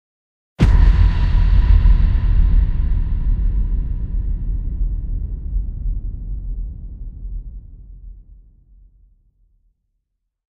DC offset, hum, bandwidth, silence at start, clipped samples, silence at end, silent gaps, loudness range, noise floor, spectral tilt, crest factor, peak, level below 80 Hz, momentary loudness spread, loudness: under 0.1%; none; 4.8 kHz; 0.6 s; under 0.1%; 2.3 s; none; 20 LU; -74 dBFS; -8.5 dB/octave; 16 dB; -2 dBFS; -18 dBFS; 19 LU; -20 LUFS